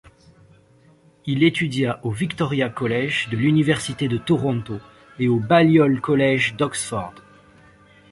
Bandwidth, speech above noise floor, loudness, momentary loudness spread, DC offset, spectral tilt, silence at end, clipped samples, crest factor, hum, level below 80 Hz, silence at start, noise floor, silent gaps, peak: 11.5 kHz; 34 dB; -20 LUFS; 11 LU; under 0.1%; -6 dB/octave; 0.9 s; under 0.1%; 20 dB; none; -54 dBFS; 1.25 s; -54 dBFS; none; -2 dBFS